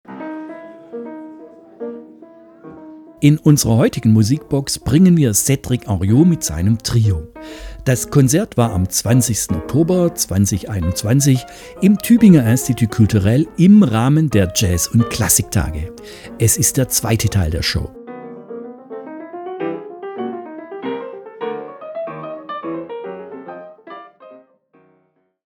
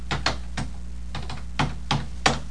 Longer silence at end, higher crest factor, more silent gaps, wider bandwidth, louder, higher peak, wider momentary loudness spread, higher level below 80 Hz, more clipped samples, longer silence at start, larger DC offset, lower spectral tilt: first, 1.2 s vs 0 s; second, 16 dB vs 24 dB; neither; first, 19.5 kHz vs 10.5 kHz; first, -15 LUFS vs -28 LUFS; first, 0 dBFS vs -4 dBFS; first, 21 LU vs 12 LU; about the same, -38 dBFS vs -36 dBFS; neither; about the same, 0.1 s vs 0 s; second, under 0.1% vs 2%; first, -5.5 dB/octave vs -4 dB/octave